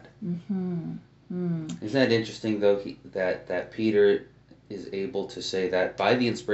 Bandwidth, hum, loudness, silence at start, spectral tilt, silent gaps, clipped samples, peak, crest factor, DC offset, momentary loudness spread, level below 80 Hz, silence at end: 8 kHz; none; -27 LUFS; 0.05 s; -4.5 dB/octave; none; under 0.1%; -8 dBFS; 20 dB; under 0.1%; 13 LU; -64 dBFS; 0 s